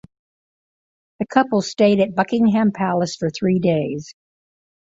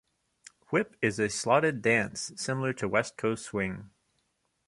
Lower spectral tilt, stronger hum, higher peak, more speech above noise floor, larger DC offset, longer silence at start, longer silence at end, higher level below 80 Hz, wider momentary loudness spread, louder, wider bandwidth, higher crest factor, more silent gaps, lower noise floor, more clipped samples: first, -6.5 dB/octave vs -4.5 dB/octave; neither; first, -2 dBFS vs -10 dBFS; first, over 72 dB vs 47 dB; neither; first, 1.2 s vs 0.7 s; about the same, 0.75 s vs 0.8 s; about the same, -58 dBFS vs -62 dBFS; about the same, 7 LU vs 9 LU; first, -19 LUFS vs -29 LUFS; second, 7.8 kHz vs 11.5 kHz; about the same, 18 dB vs 22 dB; neither; first, under -90 dBFS vs -76 dBFS; neither